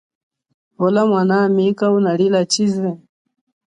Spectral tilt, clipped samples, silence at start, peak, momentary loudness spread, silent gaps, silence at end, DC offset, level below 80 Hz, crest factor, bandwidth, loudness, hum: -5.5 dB/octave; under 0.1%; 0.8 s; -4 dBFS; 7 LU; none; 0.75 s; under 0.1%; -64 dBFS; 14 dB; 10 kHz; -16 LUFS; none